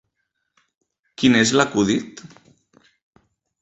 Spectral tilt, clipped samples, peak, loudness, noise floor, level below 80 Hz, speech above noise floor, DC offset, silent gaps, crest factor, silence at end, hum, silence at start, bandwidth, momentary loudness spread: -4 dB/octave; under 0.1%; -2 dBFS; -18 LUFS; -75 dBFS; -56 dBFS; 57 dB; under 0.1%; none; 20 dB; 1.4 s; none; 1.2 s; 8.4 kHz; 20 LU